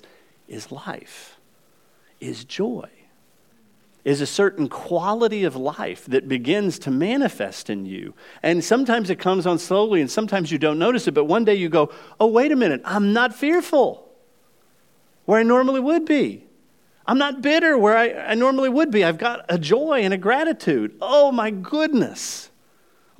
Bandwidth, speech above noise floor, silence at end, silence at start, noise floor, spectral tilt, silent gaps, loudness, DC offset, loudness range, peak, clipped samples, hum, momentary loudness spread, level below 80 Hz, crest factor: 16 kHz; 40 dB; 0.75 s; 0.5 s; -60 dBFS; -5 dB/octave; none; -20 LUFS; 0.1%; 7 LU; -4 dBFS; under 0.1%; none; 15 LU; -78 dBFS; 18 dB